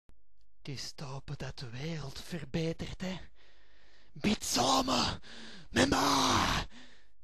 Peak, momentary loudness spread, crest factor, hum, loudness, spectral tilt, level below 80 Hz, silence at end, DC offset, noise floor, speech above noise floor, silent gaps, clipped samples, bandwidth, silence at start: -12 dBFS; 18 LU; 22 dB; none; -32 LUFS; -3.5 dB/octave; -52 dBFS; 0.4 s; 0.5%; -70 dBFS; 37 dB; none; under 0.1%; 13.5 kHz; 0.65 s